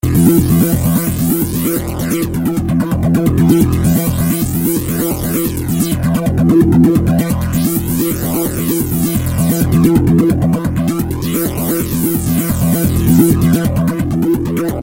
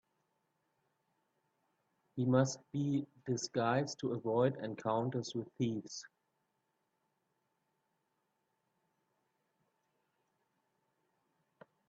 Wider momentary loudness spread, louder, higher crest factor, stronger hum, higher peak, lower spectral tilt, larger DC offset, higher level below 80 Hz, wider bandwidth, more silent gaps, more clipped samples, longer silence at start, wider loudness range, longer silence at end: second, 6 LU vs 10 LU; first, -14 LUFS vs -36 LUFS; second, 12 dB vs 22 dB; neither; first, 0 dBFS vs -18 dBFS; about the same, -6.5 dB/octave vs -6 dB/octave; neither; first, -28 dBFS vs -78 dBFS; first, 17 kHz vs 8.2 kHz; neither; neither; second, 0.05 s vs 2.15 s; second, 1 LU vs 11 LU; second, 0 s vs 5.85 s